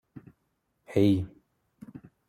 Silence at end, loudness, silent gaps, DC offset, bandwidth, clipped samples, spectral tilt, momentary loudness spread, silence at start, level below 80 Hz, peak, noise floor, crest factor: 1 s; -26 LUFS; none; under 0.1%; 14 kHz; under 0.1%; -8.5 dB/octave; 24 LU; 0.15 s; -62 dBFS; -12 dBFS; -76 dBFS; 20 dB